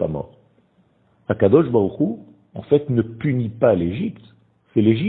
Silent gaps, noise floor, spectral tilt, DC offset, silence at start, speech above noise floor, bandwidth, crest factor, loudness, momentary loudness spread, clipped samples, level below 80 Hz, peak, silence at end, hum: none; -60 dBFS; -12.5 dB/octave; under 0.1%; 0 s; 41 dB; 4.1 kHz; 20 dB; -20 LUFS; 20 LU; under 0.1%; -52 dBFS; 0 dBFS; 0 s; none